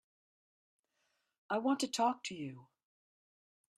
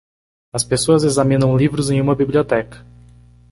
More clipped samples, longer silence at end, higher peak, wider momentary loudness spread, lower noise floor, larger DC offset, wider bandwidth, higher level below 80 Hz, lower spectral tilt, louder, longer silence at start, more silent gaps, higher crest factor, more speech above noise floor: neither; first, 1.15 s vs 0.75 s; second, -20 dBFS vs -2 dBFS; first, 12 LU vs 8 LU; first, -82 dBFS vs -45 dBFS; neither; first, 13 kHz vs 11.5 kHz; second, -88 dBFS vs -44 dBFS; second, -3.5 dB/octave vs -5.5 dB/octave; second, -36 LUFS vs -17 LUFS; first, 1.5 s vs 0.55 s; neither; about the same, 20 dB vs 16 dB; first, 46 dB vs 30 dB